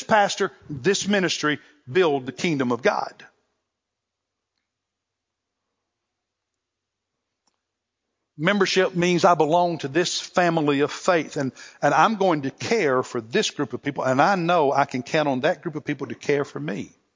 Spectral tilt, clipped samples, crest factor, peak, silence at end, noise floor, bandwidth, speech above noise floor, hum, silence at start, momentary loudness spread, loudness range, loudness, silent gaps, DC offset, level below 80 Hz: -4.5 dB/octave; under 0.1%; 22 dB; -2 dBFS; 0.25 s; -83 dBFS; 7.6 kHz; 61 dB; none; 0 s; 10 LU; 7 LU; -22 LUFS; none; under 0.1%; -68 dBFS